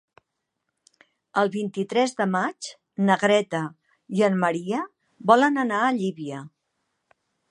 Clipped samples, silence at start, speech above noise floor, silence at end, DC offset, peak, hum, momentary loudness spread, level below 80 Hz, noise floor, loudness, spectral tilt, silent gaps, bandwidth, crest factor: under 0.1%; 1.35 s; 57 dB; 1 s; under 0.1%; -2 dBFS; none; 16 LU; -76 dBFS; -80 dBFS; -23 LUFS; -5.5 dB/octave; none; 11 kHz; 22 dB